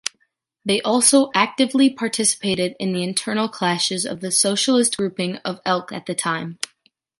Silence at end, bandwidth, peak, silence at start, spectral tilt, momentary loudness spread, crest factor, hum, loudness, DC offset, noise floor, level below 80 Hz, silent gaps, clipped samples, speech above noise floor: 0.65 s; 12 kHz; -2 dBFS; 0.05 s; -3 dB/octave; 11 LU; 20 dB; none; -19 LUFS; under 0.1%; -68 dBFS; -66 dBFS; none; under 0.1%; 48 dB